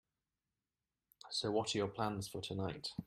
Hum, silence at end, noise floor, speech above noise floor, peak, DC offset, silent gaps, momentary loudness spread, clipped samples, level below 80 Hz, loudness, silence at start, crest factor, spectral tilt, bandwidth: none; 0 s; under -90 dBFS; over 50 dB; -22 dBFS; under 0.1%; none; 6 LU; under 0.1%; -70 dBFS; -40 LUFS; 1.25 s; 20 dB; -4.5 dB/octave; 15.5 kHz